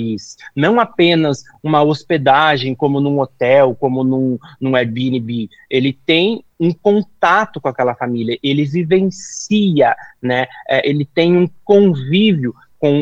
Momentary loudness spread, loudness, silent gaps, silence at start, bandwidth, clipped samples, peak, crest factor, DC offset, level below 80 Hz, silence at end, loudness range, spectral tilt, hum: 8 LU; -15 LUFS; none; 0 s; 8.2 kHz; under 0.1%; 0 dBFS; 14 dB; under 0.1%; -58 dBFS; 0 s; 2 LU; -6 dB/octave; none